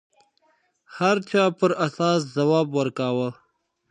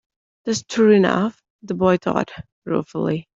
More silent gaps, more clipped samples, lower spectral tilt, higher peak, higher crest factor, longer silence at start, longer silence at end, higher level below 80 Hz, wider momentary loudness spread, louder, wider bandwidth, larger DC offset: second, none vs 1.50-1.59 s, 2.52-2.62 s; neither; about the same, -6 dB/octave vs -6 dB/octave; second, -6 dBFS vs -2 dBFS; about the same, 18 dB vs 20 dB; first, 0.9 s vs 0.45 s; first, 0.6 s vs 0.15 s; second, -74 dBFS vs -56 dBFS; second, 5 LU vs 16 LU; second, -23 LUFS vs -20 LUFS; first, 10 kHz vs 7.8 kHz; neither